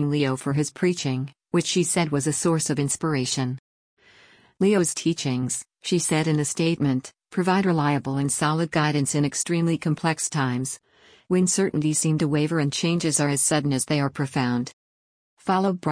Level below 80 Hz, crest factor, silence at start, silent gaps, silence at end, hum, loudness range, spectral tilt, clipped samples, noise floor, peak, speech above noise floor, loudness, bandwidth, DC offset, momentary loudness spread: -60 dBFS; 14 dB; 0 s; 3.59-3.97 s, 14.73-15.37 s; 0 s; none; 2 LU; -4.5 dB/octave; under 0.1%; -55 dBFS; -8 dBFS; 32 dB; -23 LUFS; 10.5 kHz; under 0.1%; 6 LU